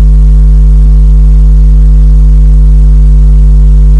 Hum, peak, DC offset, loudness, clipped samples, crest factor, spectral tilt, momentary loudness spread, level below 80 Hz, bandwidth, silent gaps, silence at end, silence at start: none; 0 dBFS; under 0.1%; -6 LUFS; 0.3%; 2 dB; -9.5 dB/octave; 0 LU; -2 dBFS; 1.4 kHz; none; 0 s; 0 s